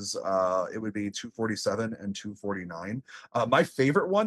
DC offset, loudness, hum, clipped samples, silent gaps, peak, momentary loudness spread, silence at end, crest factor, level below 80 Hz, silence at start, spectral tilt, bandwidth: under 0.1%; -29 LUFS; none; under 0.1%; none; -10 dBFS; 12 LU; 0 s; 18 dB; -72 dBFS; 0 s; -5 dB/octave; 12.5 kHz